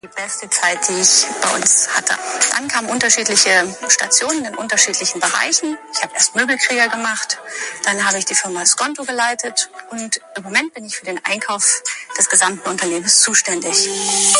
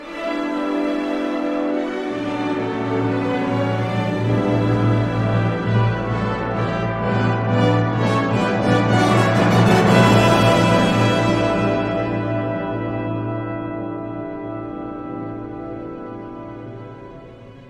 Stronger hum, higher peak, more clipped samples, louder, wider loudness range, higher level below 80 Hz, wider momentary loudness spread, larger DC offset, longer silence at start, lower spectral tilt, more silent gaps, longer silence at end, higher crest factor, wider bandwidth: neither; about the same, 0 dBFS vs -2 dBFS; neither; first, -15 LUFS vs -19 LUFS; second, 5 LU vs 13 LU; second, -66 dBFS vs -42 dBFS; second, 11 LU vs 16 LU; neither; about the same, 0.05 s vs 0 s; second, 0 dB/octave vs -6.5 dB/octave; neither; about the same, 0 s vs 0 s; about the same, 18 dB vs 18 dB; first, 16 kHz vs 12.5 kHz